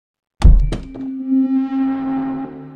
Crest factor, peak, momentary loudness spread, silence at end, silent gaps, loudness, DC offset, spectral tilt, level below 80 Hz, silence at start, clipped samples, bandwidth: 16 dB; 0 dBFS; 12 LU; 0 s; none; -19 LUFS; under 0.1%; -8.5 dB/octave; -18 dBFS; 0.4 s; under 0.1%; 9.2 kHz